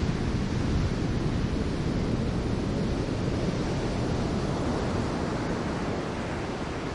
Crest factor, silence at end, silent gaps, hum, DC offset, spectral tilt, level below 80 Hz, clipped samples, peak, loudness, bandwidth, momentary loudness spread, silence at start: 12 dB; 0 s; none; none; under 0.1%; -6.5 dB/octave; -36 dBFS; under 0.1%; -16 dBFS; -29 LUFS; 11.5 kHz; 3 LU; 0 s